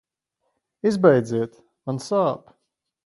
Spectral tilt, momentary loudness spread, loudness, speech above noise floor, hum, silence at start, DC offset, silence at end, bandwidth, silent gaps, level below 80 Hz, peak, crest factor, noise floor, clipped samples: -7 dB/octave; 16 LU; -22 LUFS; 56 dB; none; 0.85 s; under 0.1%; 0.7 s; 11.5 kHz; none; -66 dBFS; -2 dBFS; 22 dB; -77 dBFS; under 0.1%